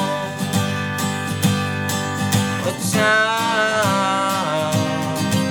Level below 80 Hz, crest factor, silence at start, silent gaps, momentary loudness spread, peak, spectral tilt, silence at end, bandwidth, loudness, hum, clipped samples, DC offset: -60 dBFS; 16 dB; 0 s; none; 6 LU; -4 dBFS; -4 dB/octave; 0 s; over 20 kHz; -19 LUFS; none; under 0.1%; 0.1%